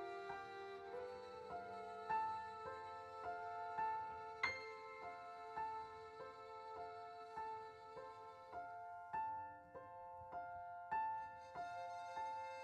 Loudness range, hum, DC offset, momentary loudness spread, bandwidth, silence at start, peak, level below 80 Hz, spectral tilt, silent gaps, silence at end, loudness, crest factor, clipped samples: 6 LU; none; under 0.1%; 11 LU; 10 kHz; 0 s; -26 dBFS; -80 dBFS; -4 dB/octave; none; 0 s; -49 LUFS; 24 dB; under 0.1%